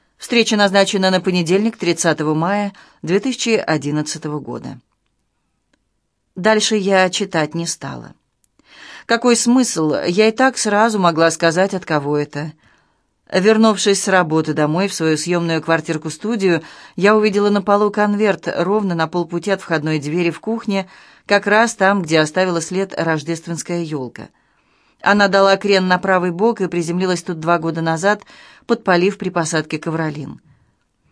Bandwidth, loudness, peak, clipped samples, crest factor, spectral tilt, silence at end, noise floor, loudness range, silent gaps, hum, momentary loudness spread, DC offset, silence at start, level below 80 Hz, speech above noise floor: 11 kHz; -17 LUFS; 0 dBFS; under 0.1%; 18 dB; -4.5 dB/octave; 0.8 s; -69 dBFS; 4 LU; none; none; 11 LU; under 0.1%; 0.2 s; -62 dBFS; 52 dB